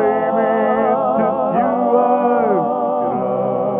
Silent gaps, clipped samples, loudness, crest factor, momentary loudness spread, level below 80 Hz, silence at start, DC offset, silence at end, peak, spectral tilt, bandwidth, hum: none; under 0.1%; -16 LUFS; 14 dB; 4 LU; -58 dBFS; 0 s; under 0.1%; 0 s; -2 dBFS; -12 dB/octave; 3.8 kHz; none